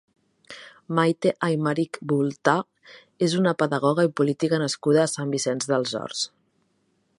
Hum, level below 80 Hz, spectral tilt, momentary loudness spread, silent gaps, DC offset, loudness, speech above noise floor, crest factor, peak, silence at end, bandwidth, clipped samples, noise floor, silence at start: none; -72 dBFS; -5 dB/octave; 9 LU; none; under 0.1%; -24 LUFS; 46 dB; 22 dB; -2 dBFS; 0.9 s; 11.5 kHz; under 0.1%; -69 dBFS; 0.5 s